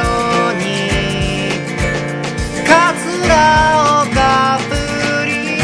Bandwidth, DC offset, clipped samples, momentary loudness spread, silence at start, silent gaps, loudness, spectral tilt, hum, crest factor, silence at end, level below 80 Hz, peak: 11 kHz; under 0.1%; under 0.1%; 8 LU; 0 s; none; -14 LUFS; -4.5 dB/octave; none; 14 dB; 0 s; -28 dBFS; 0 dBFS